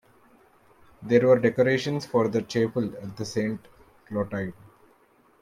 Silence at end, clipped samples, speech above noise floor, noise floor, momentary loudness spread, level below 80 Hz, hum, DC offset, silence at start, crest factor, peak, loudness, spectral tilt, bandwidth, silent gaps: 0.9 s; under 0.1%; 36 dB; -61 dBFS; 15 LU; -62 dBFS; none; under 0.1%; 1 s; 20 dB; -6 dBFS; -25 LUFS; -6.5 dB/octave; 13.5 kHz; none